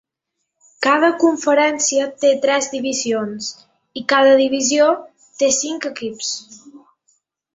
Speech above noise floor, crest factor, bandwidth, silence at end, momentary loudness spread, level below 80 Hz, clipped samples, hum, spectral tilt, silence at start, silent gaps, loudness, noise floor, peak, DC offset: 60 dB; 16 dB; 8 kHz; 0.8 s; 12 LU; -66 dBFS; under 0.1%; none; -1.5 dB/octave; 0.8 s; none; -17 LUFS; -77 dBFS; -2 dBFS; under 0.1%